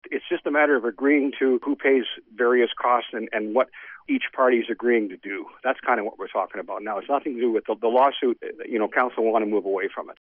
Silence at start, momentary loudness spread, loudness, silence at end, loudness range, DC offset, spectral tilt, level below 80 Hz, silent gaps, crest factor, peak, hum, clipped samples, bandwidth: 0.05 s; 10 LU; -23 LUFS; 0.1 s; 3 LU; under 0.1%; -1.5 dB/octave; -74 dBFS; none; 16 dB; -8 dBFS; none; under 0.1%; 4.4 kHz